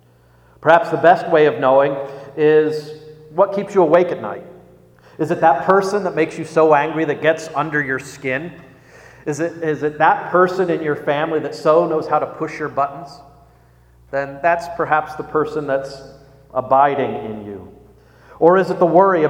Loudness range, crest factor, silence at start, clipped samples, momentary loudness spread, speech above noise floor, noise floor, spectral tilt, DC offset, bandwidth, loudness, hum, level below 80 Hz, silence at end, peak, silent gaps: 6 LU; 18 dB; 0.6 s; under 0.1%; 14 LU; 34 dB; -51 dBFS; -6.5 dB/octave; under 0.1%; 11.5 kHz; -17 LUFS; none; -56 dBFS; 0 s; 0 dBFS; none